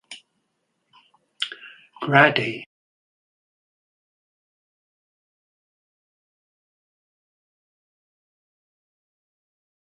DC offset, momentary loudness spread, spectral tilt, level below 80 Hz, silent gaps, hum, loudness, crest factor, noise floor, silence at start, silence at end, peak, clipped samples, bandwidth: under 0.1%; 26 LU; -5.5 dB/octave; -74 dBFS; none; none; -20 LUFS; 30 dB; -74 dBFS; 0.1 s; 7.35 s; 0 dBFS; under 0.1%; 11 kHz